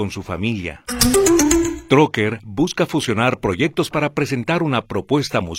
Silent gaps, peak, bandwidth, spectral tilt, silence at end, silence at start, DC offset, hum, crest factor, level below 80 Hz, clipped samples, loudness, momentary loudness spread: none; 0 dBFS; 16.5 kHz; -4.5 dB/octave; 0 s; 0 s; under 0.1%; none; 18 dB; -38 dBFS; under 0.1%; -18 LUFS; 9 LU